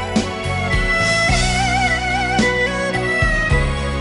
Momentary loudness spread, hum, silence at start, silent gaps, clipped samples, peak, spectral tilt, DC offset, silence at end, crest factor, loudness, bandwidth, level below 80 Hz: 6 LU; none; 0 s; none; under 0.1%; -4 dBFS; -4 dB/octave; under 0.1%; 0 s; 14 dB; -17 LUFS; 11.5 kHz; -26 dBFS